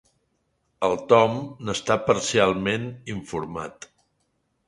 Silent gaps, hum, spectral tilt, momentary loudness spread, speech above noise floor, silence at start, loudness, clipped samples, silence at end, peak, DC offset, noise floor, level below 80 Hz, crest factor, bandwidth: none; none; -4.5 dB/octave; 15 LU; 49 dB; 0.8 s; -23 LUFS; under 0.1%; 0.95 s; -2 dBFS; under 0.1%; -72 dBFS; -54 dBFS; 22 dB; 11.5 kHz